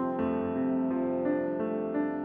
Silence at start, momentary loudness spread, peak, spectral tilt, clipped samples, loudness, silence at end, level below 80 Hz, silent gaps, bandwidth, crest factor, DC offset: 0 s; 2 LU; -18 dBFS; -11 dB/octave; under 0.1%; -30 LUFS; 0 s; -66 dBFS; none; 3.6 kHz; 12 dB; under 0.1%